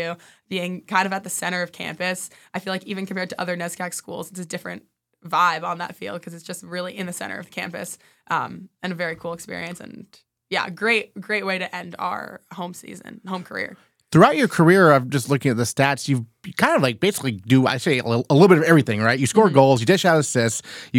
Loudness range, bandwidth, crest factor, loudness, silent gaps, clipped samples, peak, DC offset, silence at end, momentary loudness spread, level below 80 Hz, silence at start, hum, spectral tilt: 12 LU; 17 kHz; 22 dB; -21 LUFS; none; under 0.1%; 0 dBFS; under 0.1%; 0 s; 18 LU; -66 dBFS; 0 s; none; -5 dB/octave